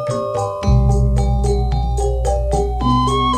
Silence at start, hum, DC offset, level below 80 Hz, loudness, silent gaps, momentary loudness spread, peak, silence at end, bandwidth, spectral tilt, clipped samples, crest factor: 0 s; none; under 0.1%; -20 dBFS; -18 LUFS; none; 5 LU; -2 dBFS; 0 s; 10.5 kHz; -7 dB/octave; under 0.1%; 14 dB